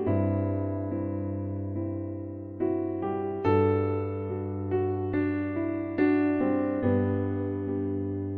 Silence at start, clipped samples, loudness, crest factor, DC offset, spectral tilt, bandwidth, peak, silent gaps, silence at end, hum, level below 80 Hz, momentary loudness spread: 0 s; under 0.1%; -29 LUFS; 16 dB; under 0.1%; -11.5 dB/octave; 4.4 kHz; -12 dBFS; none; 0 s; none; -62 dBFS; 8 LU